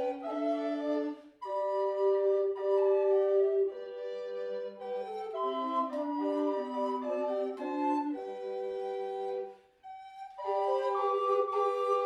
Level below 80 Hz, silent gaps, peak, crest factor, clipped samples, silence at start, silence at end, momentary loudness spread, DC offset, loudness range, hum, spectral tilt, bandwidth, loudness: -82 dBFS; none; -18 dBFS; 14 dB; under 0.1%; 0 s; 0 s; 12 LU; under 0.1%; 6 LU; none; -5 dB/octave; 7.4 kHz; -32 LUFS